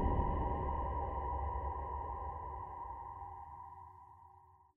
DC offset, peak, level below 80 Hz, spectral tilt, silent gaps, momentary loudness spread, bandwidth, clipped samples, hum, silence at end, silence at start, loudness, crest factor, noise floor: under 0.1%; -20 dBFS; -44 dBFS; -10.5 dB/octave; none; 19 LU; 3.2 kHz; under 0.1%; none; 0.25 s; 0 s; -41 LUFS; 20 dB; -63 dBFS